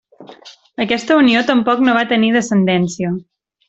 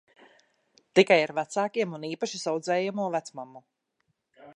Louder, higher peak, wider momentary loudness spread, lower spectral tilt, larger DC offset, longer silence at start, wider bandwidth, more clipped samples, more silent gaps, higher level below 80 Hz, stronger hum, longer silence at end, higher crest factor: first, -14 LUFS vs -27 LUFS; first, -2 dBFS vs -6 dBFS; second, 11 LU vs 14 LU; about the same, -5.5 dB/octave vs -4.5 dB/octave; neither; second, 0.2 s vs 0.95 s; second, 8.2 kHz vs 10.5 kHz; neither; neither; first, -56 dBFS vs -80 dBFS; neither; first, 0.5 s vs 0.05 s; second, 14 dB vs 24 dB